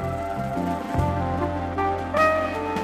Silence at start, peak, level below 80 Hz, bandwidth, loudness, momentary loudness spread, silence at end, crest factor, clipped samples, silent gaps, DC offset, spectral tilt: 0 s; -8 dBFS; -40 dBFS; 15 kHz; -24 LUFS; 7 LU; 0 s; 16 dB; under 0.1%; none; under 0.1%; -7 dB/octave